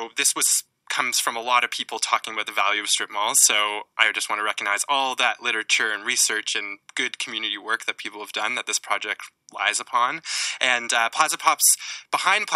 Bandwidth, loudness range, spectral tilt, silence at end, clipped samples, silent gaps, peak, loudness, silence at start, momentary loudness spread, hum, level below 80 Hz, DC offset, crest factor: 17.5 kHz; 5 LU; 2 dB/octave; 0 s; under 0.1%; none; 0 dBFS; -22 LUFS; 0 s; 9 LU; none; -86 dBFS; under 0.1%; 24 dB